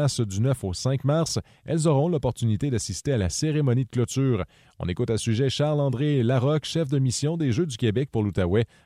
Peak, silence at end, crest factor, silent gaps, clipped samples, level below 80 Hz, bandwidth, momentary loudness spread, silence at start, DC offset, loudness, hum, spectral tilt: -10 dBFS; 0.2 s; 14 dB; none; under 0.1%; -48 dBFS; 13 kHz; 5 LU; 0 s; under 0.1%; -25 LUFS; none; -6 dB/octave